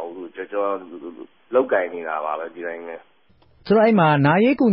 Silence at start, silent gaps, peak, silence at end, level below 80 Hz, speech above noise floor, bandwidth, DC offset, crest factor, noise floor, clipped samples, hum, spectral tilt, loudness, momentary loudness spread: 0 s; none; -6 dBFS; 0 s; -62 dBFS; 38 dB; 5.6 kHz; 0.1%; 14 dB; -58 dBFS; under 0.1%; none; -12 dB/octave; -20 LUFS; 21 LU